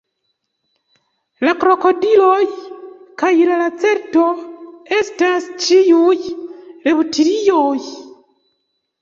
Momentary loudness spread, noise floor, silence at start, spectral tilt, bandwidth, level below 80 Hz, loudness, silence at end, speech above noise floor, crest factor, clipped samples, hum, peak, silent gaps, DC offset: 20 LU; -71 dBFS; 1.4 s; -3 dB/octave; 7.6 kHz; -62 dBFS; -15 LUFS; 0.95 s; 57 dB; 14 dB; under 0.1%; none; -2 dBFS; none; under 0.1%